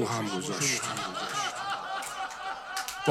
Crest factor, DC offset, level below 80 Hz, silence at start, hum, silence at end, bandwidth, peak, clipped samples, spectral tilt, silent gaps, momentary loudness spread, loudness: 22 dB; under 0.1%; -66 dBFS; 0 s; none; 0 s; 16.5 kHz; -12 dBFS; under 0.1%; -2.5 dB/octave; none; 8 LU; -32 LUFS